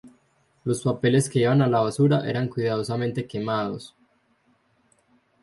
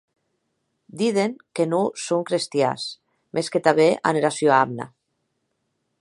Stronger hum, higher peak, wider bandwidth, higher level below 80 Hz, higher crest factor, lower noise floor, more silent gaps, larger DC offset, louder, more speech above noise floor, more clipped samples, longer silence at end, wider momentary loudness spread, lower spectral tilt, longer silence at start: neither; second, -8 dBFS vs -2 dBFS; about the same, 11.5 kHz vs 11.5 kHz; first, -62 dBFS vs -72 dBFS; second, 16 dB vs 22 dB; second, -65 dBFS vs -74 dBFS; neither; neither; about the same, -24 LUFS vs -22 LUFS; second, 43 dB vs 53 dB; neither; first, 1.55 s vs 1.15 s; second, 9 LU vs 12 LU; first, -6.5 dB/octave vs -4.5 dB/octave; second, 0.05 s vs 0.95 s